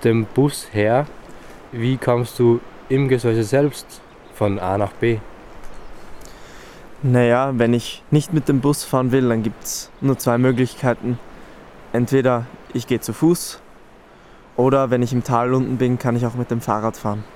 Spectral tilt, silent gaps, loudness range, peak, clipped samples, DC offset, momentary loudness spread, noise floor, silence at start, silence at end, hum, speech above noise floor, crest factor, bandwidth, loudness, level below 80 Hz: -6.5 dB/octave; none; 4 LU; -2 dBFS; under 0.1%; under 0.1%; 10 LU; -45 dBFS; 0 s; 0 s; none; 27 dB; 16 dB; 16.5 kHz; -19 LUFS; -46 dBFS